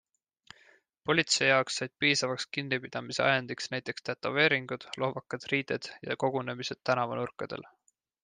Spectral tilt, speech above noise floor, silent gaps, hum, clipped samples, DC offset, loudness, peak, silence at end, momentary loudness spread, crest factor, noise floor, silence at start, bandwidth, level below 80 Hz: -3.5 dB/octave; 33 dB; none; none; under 0.1%; under 0.1%; -30 LUFS; -10 dBFS; 0.55 s; 12 LU; 22 dB; -63 dBFS; 1.05 s; 10 kHz; -72 dBFS